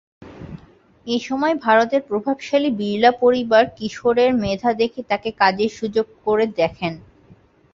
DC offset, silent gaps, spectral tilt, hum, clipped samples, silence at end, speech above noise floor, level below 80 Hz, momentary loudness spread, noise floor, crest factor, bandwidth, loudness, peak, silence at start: under 0.1%; none; -5.5 dB/octave; none; under 0.1%; 0.75 s; 33 dB; -52 dBFS; 12 LU; -51 dBFS; 18 dB; 7.6 kHz; -19 LUFS; -2 dBFS; 0.2 s